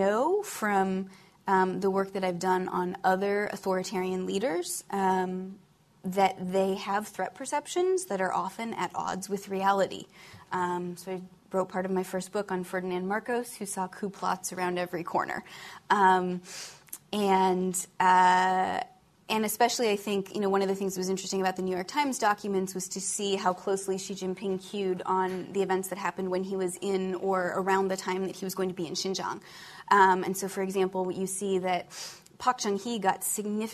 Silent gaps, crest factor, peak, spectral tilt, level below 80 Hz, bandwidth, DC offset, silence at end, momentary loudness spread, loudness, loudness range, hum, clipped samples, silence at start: none; 20 dB; -10 dBFS; -4 dB/octave; -70 dBFS; 14 kHz; under 0.1%; 0 s; 10 LU; -29 LUFS; 6 LU; none; under 0.1%; 0 s